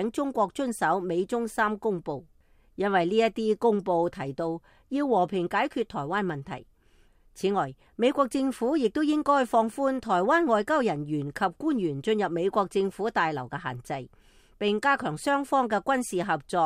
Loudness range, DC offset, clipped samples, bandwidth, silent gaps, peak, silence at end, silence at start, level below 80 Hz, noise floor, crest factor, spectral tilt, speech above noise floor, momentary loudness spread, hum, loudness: 4 LU; under 0.1%; under 0.1%; 15.5 kHz; none; -10 dBFS; 0 s; 0 s; -60 dBFS; -60 dBFS; 16 dB; -5.5 dB/octave; 34 dB; 10 LU; none; -27 LUFS